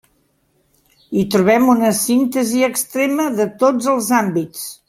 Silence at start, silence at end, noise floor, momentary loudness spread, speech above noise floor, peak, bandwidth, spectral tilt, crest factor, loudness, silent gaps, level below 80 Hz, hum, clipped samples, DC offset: 1.1 s; 0.15 s; -62 dBFS; 8 LU; 46 dB; 0 dBFS; 16.5 kHz; -4.5 dB/octave; 16 dB; -16 LUFS; none; -58 dBFS; none; under 0.1%; under 0.1%